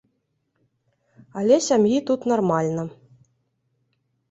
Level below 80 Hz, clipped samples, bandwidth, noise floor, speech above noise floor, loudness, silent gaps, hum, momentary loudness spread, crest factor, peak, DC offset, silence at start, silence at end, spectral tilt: -66 dBFS; under 0.1%; 8.2 kHz; -73 dBFS; 52 dB; -21 LUFS; none; none; 14 LU; 20 dB; -4 dBFS; under 0.1%; 1.35 s; 1.4 s; -5.5 dB/octave